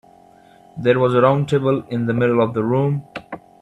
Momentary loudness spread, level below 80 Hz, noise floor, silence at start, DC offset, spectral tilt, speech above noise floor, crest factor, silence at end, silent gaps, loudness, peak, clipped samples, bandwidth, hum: 18 LU; -56 dBFS; -48 dBFS; 0.75 s; under 0.1%; -8.5 dB/octave; 31 dB; 18 dB; 0.25 s; none; -18 LUFS; 0 dBFS; under 0.1%; 9.6 kHz; none